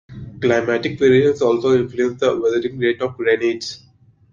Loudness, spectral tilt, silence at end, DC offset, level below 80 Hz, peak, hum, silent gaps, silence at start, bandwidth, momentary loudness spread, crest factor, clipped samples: -18 LUFS; -6 dB/octave; 0.55 s; under 0.1%; -54 dBFS; -2 dBFS; none; none; 0.1 s; 7.4 kHz; 9 LU; 16 dB; under 0.1%